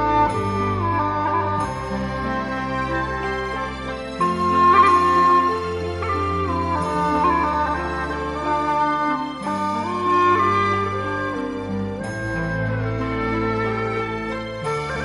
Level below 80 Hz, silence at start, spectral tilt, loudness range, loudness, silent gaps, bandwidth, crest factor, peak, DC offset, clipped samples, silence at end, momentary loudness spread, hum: -40 dBFS; 0 s; -6.5 dB/octave; 6 LU; -21 LUFS; none; 11.5 kHz; 16 dB; -4 dBFS; under 0.1%; under 0.1%; 0 s; 11 LU; none